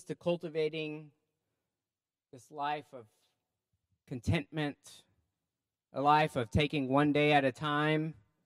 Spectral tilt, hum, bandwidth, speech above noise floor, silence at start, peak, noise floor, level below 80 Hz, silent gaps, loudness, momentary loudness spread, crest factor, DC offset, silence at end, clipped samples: -6.5 dB/octave; none; 12.5 kHz; over 58 dB; 0.1 s; -12 dBFS; under -90 dBFS; -58 dBFS; none; -32 LUFS; 15 LU; 22 dB; under 0.1%; 0.35 s; under 0.1%